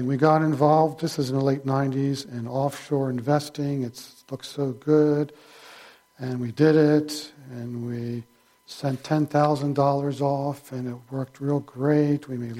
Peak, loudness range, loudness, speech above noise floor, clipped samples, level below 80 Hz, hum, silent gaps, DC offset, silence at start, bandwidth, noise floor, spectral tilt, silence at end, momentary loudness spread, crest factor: -6 dBFS; 3 LU; -24 LUFS; 26 dB; under 0.1%; -66 dBFS; none; none; under 0.1%; 0 s; 15.5 kHz; -50 dBFS; -7 dB/octave; 0 s; 14 LU; 18 dB